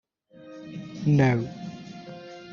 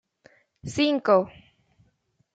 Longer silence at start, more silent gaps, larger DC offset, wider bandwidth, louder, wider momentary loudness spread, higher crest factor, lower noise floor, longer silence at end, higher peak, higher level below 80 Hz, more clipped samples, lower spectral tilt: second, 0.4 s vs 0.65 s; neither; neither; second, 7 kHz vs 9.2 kHz; about the same, -24 LUFS vs -23 LUFS; first, 21 LU vs 17 LU; about the same, 20 dB vs 20 dB; second, -50 dBFS vs -69 dBFS; second, 0 s vs 1.05 s; about the same, -8 dBFS vs -6 dBFS; about the same, -60 dBFS vs -62 dBFS; neither; first, -7.5 dB/octave vs -5 dB/octave